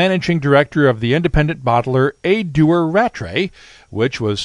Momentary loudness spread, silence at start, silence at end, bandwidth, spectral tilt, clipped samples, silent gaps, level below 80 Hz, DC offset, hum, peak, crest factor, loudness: 7 LU; 0 s; 0 s; 10.5 kHz; -7 dB/octave; under 0.1%; none; -34 dBFS; under 0.1%; none; 0 dBFS; 16 dB; -16 LUFS